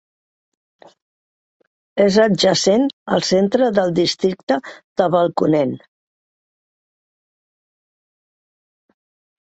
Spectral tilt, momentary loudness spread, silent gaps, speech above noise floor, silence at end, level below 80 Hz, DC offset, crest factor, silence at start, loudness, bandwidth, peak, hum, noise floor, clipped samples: -5 dB/octave; 8 LU; 2.93-3.06 s, 4.43-4.47 s, 4.84-4.96 s; over 74 dB; 3.8 s; -60 dBFS; under 0.1%; 18 dB; 1.95 s; -17 LUFS; 8.2 kHz; -2 dBFS; none; under -90 dBFS; under 0.1%